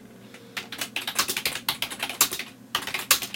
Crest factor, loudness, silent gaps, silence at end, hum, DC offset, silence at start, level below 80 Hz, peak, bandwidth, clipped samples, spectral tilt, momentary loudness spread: 28 dB; -26 LUFS; none; 0 s; none; under 0.1%; 0 s; -64 dBFS; 0 dBFS; 17 kHz; under 0.1%; 0.5 dB/octave; 14 LU